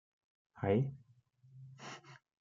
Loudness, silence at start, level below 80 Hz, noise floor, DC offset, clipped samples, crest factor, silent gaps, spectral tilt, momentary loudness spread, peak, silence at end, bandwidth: -37 LUFS; 0.55 s; -76 dBFS; -67 dBFS; under 0.1%; under 0.1%; 22 dB; none; -8 dB/octave; 24 LU; -18 dBFS; 0.25 s; 7.6 kHz